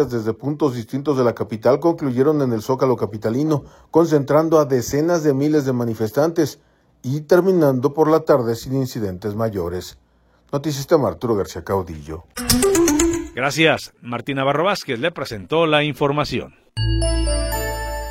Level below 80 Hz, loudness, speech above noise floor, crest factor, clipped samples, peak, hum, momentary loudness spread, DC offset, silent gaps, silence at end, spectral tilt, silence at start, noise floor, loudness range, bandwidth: -34 dBFS; -19 LUFS; 38 dB; 20 dB; under 0.1%; 0 dBFS; none; 10 LU; under 0.1%; none; 0 s; -5 dB/octave; 0 s; -57 dBFS; 3 LU; 16.5 kHz